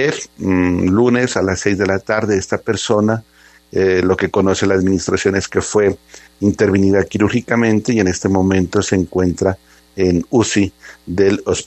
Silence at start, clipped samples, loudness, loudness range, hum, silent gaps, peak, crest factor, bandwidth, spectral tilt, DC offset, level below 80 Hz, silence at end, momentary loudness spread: 0 s; under 0.1%; -16 LUFS; 1 LU; none; none; 0 dBFS; 16 dB; 8.8 kHz; -5.5 dB/octave; under 0.1%; -48 dBFS; 0 s; 5 LU